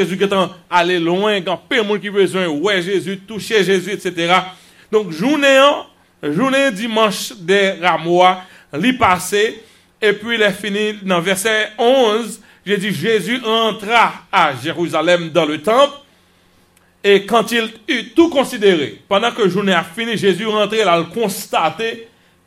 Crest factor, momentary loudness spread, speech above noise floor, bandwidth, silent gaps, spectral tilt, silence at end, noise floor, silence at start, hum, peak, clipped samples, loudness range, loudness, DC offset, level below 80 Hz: 16 dB; 7 LU; 38 dB; 16 kHz; none; -4 dB/octave; 0.4 s; -53 dBFS; 0 s; none; 0 dBFS; under 0.1%; 2 LU; -16 LUFS; under 0.1%; -58 dBFS